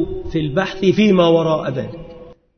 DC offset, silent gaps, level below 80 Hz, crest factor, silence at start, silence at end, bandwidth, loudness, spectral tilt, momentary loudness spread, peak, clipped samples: under 0.1%; none; -38 dBFS; 16 dB; 0 s; 0.25 s; 6.6 kHz; -16 LUFS; -7 dB/octave; 14 LU; -2 dBFS; under 0.1%